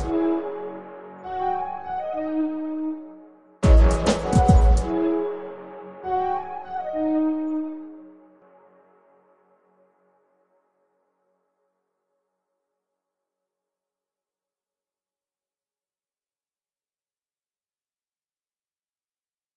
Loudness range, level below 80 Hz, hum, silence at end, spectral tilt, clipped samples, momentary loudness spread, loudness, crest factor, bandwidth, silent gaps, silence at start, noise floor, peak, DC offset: 9 LU; -30 dBFS; none; 11.45 s; -7.5 dB/octave; under 0.1%; 21 LU; -23 LUFS; 22 dB; 10.5 kHz; none; 0 s; under -90 dBFS; -4 dBFS; under 0.1%